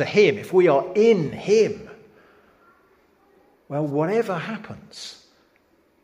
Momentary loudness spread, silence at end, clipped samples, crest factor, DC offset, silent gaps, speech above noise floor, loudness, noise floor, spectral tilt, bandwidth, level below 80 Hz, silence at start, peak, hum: 19 LU; 0.9 s; under 0.1%; 18 dB; under 0.1%; none; 41 dB; -21 LUFS; -62 dBFS; -6 dB/octave; 14.5 kHz; -64 dBFS; 0 s; -4 dBFS; none